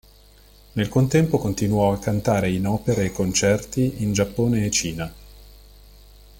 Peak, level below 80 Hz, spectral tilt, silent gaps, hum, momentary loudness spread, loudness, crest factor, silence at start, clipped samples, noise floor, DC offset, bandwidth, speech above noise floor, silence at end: -6 dBFS; -44 dBFS; -5.5 dB/octave; none; 50 Hz at -40 dBFS; 6 LU; -22 LUFS; 16 dB; 0.75 s; under 0.1%; -50 dBFS; under 0.1%; 17 kHz; 29 dB; 0.85 s